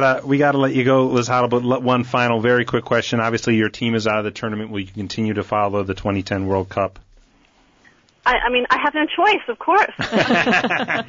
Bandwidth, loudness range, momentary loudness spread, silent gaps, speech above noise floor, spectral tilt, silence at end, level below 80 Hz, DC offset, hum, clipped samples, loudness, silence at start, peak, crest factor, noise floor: 7.8 kHz; 6 LU; 8 LU; none; 37 dB; -5.5 dB/octave; 0 s; -48 dBFS; under 0.1%; none; under 0.1%; -19 LUFS; 0 s; -4 dBFS; 14 dB; -56 dBFS